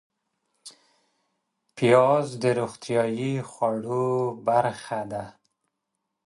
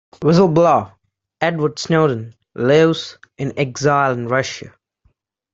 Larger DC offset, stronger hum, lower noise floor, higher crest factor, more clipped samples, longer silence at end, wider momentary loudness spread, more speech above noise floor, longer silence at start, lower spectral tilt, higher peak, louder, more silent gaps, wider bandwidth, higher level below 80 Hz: neither; neither; first, -81 dBFS vs -62 dBFS; about the same, 20 dB vs 16 dB; neither; first, 1 s vs 0.85 s; about the same, 13 LU vs 14 LU; first, 57 dB vs 46 dB; first, 0.65 s vs 0.2 s; about the same, -6.5 dB/octave vs -6 dB/octave; second, -6 dBFS vs -2 dBFS; second, -25 LUFS vs -17 LUFS; neither; first, 11.5 kHz vs 7.8 kHz; second, -68 dBFS vs -56 dBFS